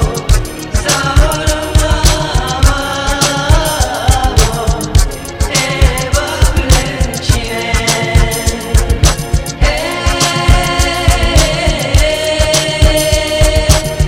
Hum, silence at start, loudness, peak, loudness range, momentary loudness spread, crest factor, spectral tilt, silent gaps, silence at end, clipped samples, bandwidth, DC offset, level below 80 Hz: none; 0 s; -12 LUFS; 0 dBFS; 2 LU; 5 LU; 12 dB; -4 dB/octave; none; 0 s; 1%; 17 kHz; under 0.1%; -14 dBFS